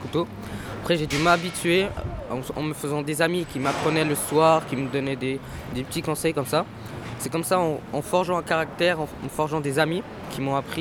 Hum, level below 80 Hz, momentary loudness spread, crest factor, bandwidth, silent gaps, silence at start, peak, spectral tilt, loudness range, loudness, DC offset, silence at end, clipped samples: none; -48 dBFS; 12 LU; 20 dB; 19.5 kHz; none; 0 s; -4 dBFS; -5 dB/octave; 3 LU; -25 LUFS; under 0.1%; 0 s; under 0.1%